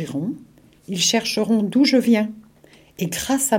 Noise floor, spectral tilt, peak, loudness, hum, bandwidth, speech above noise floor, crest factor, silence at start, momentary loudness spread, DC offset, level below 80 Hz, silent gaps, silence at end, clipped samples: -51 dBFS; -3.5 dB/octave; -4 dBFS; -20 LUFS; none; 16.5 kHz; 32 dB; 16 dB; 0 s; 13 LU; under 0.1%; -56 dBFS; none; 0 s; under 0.1%